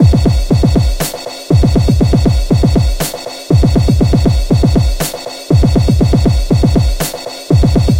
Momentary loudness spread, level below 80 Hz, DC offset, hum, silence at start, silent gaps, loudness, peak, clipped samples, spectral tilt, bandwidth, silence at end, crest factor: 9 LU; -16 dBFS; under 0.1%; none; 0 s; none; -12 LUFS; 0 dBFS; under 0.1%; -6.5 dB/octave; 16 kHz; 0 s; 10 dB